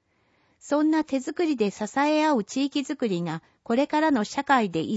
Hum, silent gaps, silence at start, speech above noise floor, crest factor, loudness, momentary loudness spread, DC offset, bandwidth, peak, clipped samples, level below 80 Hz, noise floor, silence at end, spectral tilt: none; none; 0.65 s; 42 dB; 16 dB; -25 LUFS; 6 LU; under 0.1%; 8 kHz; -8 dBFS; under 0.1%; -68 dBFS; -67 dBFS; 0 s; -5 dB/octave